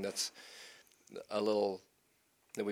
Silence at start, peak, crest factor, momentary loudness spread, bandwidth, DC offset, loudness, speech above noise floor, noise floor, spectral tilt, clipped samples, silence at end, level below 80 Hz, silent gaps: 0 s; -20 dBFS; 18 dB; 19 LU; 19 kHz; under 0.1%; -37 LUFS; 37 dB; -74 dBFS; -3 dB/octave; under 0.1%; 0 s; -88 dBFS; none